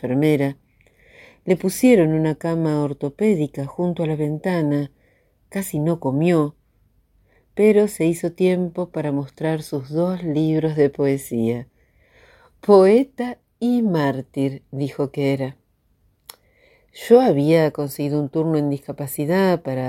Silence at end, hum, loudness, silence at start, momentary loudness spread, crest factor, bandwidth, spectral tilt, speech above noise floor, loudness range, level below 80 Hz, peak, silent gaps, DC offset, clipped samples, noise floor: 0 s; none; -20 LUFS; 0.05 s; 11 LU; 20 dB; 17 kHz; -7 dB/octave; 43 dB; 4 LU; -58 dBFS; 0 dBFS; none; under 0.1%; under 0.1%; -62 dBFS